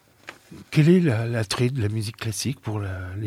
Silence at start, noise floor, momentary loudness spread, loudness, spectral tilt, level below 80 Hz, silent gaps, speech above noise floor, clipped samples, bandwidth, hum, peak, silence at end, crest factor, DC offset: 0.25 s; -46 dBFS; 17 LU; -23 LUFS; -6 dB/octave; -56 dBFS; none; 24 dB; under 0.1%; 15.5 kHz; none; -6 dBFS; 0 s; 18 dB; under 0.1%